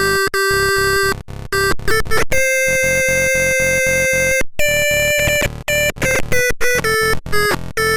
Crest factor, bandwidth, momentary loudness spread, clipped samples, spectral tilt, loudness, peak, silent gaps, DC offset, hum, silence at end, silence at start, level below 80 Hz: 10 dB; 16.5 kHz; 4 LU; under 0.1%; -2.5 dB/octave; -15 LUFS; -4 dBFS; none; under 0.1%; none; 0 s; 0 s; -30 dBFS